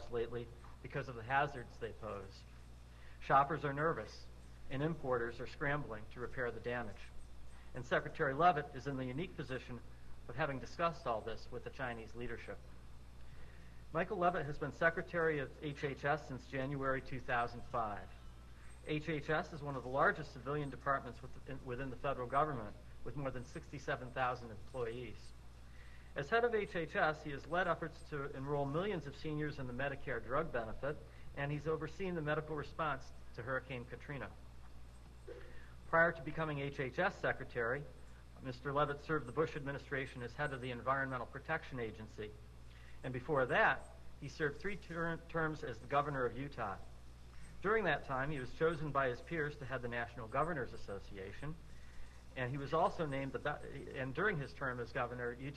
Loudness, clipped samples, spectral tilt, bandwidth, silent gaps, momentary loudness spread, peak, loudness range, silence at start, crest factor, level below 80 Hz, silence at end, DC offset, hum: -40 LUFS; under 0.1%; -6.5 dB/octave; 13 kHz; none; 21 LU; -18 dBFS; 5 LU; 0 s; 22 dB; -56 dBFS; 0 s; under 0.1%; none